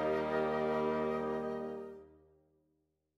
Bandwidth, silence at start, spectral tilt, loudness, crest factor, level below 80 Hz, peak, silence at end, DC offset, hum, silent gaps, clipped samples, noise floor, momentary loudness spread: 11.5 kHz; 0 s; -7 dB/octave; -36 LUFS; 16 dB; -66 dBFS; -22 dBFS; 1.1 s; under 0.1%; none; none; under 0.1%; -80 dBFS; 13 LU